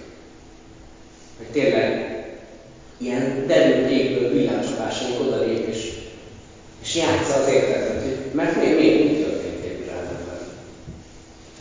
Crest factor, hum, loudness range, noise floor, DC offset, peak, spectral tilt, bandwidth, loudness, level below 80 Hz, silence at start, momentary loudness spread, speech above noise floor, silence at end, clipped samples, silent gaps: 20 dB; none; 4 LU; -44 dBFS; under 0.1%; -4 dBFS; -5 dB/octave; 7.6 kHz; -21 LUFS; -48 dBFS; 0 s; 21 LU; 25 dB; 0 s; under 0.1%; none